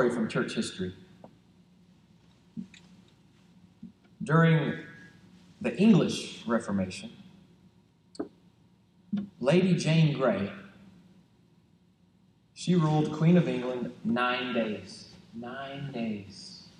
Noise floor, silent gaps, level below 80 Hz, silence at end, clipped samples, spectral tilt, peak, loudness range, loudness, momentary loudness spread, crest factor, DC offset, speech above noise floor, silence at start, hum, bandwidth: -64 dBFS; none; -70 dBFS; 0.15 s; under 0.1%; -6.5 dB/octave; -10 dBFS; 8 LU; -28 LUFS; 21 LU; 20 dB; under 0.1%; 37 dB; 0 s; none; 10.5 kHz